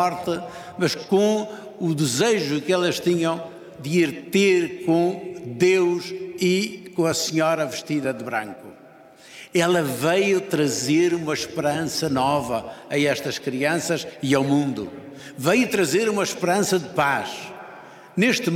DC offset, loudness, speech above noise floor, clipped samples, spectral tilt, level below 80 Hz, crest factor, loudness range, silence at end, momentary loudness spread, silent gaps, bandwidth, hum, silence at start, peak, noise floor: under 0.1%; -22 LUFS; 26 dB; under 0.1%; -4.5 dB/octave; -64 dBFS; 18 dB; 2 LU; 0 s; 12 LU; none; 17 kHz; none; 0 s; -4 dBFS; -48 dBFS